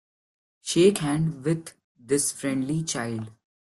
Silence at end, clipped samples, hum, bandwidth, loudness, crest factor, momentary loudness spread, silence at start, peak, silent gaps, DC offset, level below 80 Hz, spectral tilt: 0.45 s; under 0.1%; none; 12.5 kHz; -25 LUFS; 18 dB; 16 LU; 0.65 s; -8 dBFS; 1.84-1.95 s; under 0.1%; -60 dBFS; -5 dB/octave